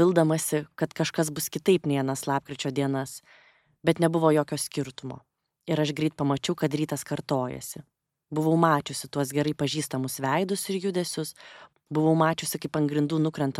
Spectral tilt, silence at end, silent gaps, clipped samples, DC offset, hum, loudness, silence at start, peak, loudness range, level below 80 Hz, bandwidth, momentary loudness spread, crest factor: -5.5 dB/octave; 0 s; none; under 0.1%; under 0.1%; none; -27 LUFS; 0 s; -6 dBFS; 3 LU; -66 dBFS; 16.5 kHz; 11 LU; 20 dB